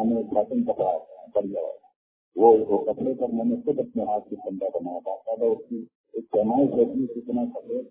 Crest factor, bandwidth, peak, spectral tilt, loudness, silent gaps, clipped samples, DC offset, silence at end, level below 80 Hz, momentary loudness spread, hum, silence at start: 20 dB; 3.6 kHz; -6 dBFS; -12.5 dB/octave; -25 LUFS; 1.96-2.32 s, 5.95-6.04 s; under 0.1%; under 0.1%; 0.05 s; -64 dBFS; 14 LU; none; 0 s